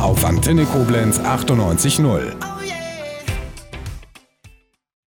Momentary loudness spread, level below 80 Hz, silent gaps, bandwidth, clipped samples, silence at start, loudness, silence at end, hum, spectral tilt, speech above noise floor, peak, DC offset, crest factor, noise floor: 17 LU; -32 dBFS; none; 18 kHz; under 0.1%; 0 s; -18 LUFS; 0.6 s; none; -5 dB/octave; 32 dB; -4 dBFS; under 0.1%; 14 dB; -49 dBFS